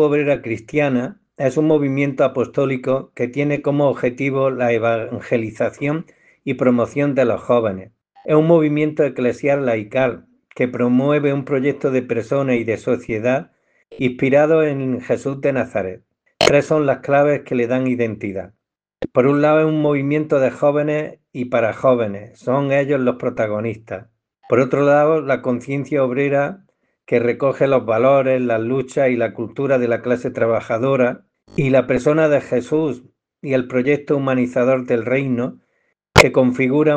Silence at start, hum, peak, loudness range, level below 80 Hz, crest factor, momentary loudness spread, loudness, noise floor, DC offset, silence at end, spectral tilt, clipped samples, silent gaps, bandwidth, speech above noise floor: 0 s; none; 0 dBFS; 2 LU; -48 dBFS; 18 dB; 9 LU; -18 LUFS; -67 dBFS; under 0.1%; 0 s; -6.5 dB/octave; under 0.1%; none; 10 kHz; 50 dB